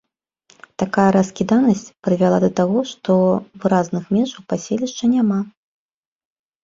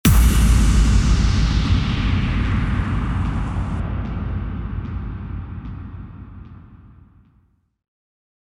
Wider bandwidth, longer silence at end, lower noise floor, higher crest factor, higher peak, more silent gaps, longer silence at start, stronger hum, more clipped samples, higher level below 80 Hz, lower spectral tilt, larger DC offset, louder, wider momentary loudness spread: second, 7.6 kHz vs 16 kHz; second, 1.15 s vs 1.75 s; about the same, -59 dBFS vs -60 dBFS; about the same, 18 dB vs 16 dB; about the same, -2 dBFS vs -4 dBFS; neither; first, 0.8 s vs 0.05 s; neither; neither; second, -56 dBFS vs -22 dBFS; first, -7 dB/octave vs -5.5 dB/octave; neither; first, -18 LUFS vs -21 LUFS; second, 8 LU vs 19 LU